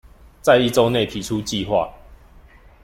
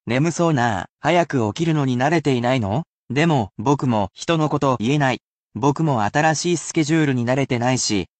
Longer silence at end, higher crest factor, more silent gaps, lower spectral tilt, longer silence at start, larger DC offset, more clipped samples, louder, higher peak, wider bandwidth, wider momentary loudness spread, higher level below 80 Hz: first, 0.7 s vs 0.15 s; about the same, 18 dB vs 14 dB; second, none vs 0.90-0.97 s, 2.87-3.08 s, 5.22-5.47 s; about the same, -5 dB/octave vs -5.5 dB/octave; first, 0.45 s vs 0.05 s; neither; neither; about the same, -19 LUFS vs -20 LUFS; first, -2 dBFS vs -6 dBFS; first, 16.5 kHz vs 9 kHz; first, 9 LU vs 4 LU; first, -46 dBFS vs -56 dBFS